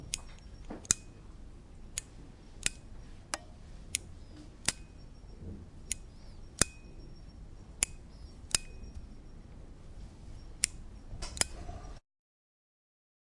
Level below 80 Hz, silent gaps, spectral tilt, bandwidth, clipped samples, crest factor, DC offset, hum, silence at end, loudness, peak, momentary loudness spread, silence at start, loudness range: -50 dBFS; none; -1.5 dB/octave; 11.5 kHz; under 0.1%; 38 dB; under 0.1%; none; 1.3 s; -35 LUFS; -4 dBFS; 22 LU; 0 s; 4 LU